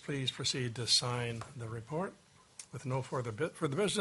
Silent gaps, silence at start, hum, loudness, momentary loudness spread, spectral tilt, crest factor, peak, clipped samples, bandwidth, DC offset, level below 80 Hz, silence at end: none; 0 s; none; -35 LUFS; 15 LU; -3.5 dB/octave; 20 dB; -16 dBFS; under 0.1%; 11.5 kHz; under 0.1%; -68 dBFS; 0 s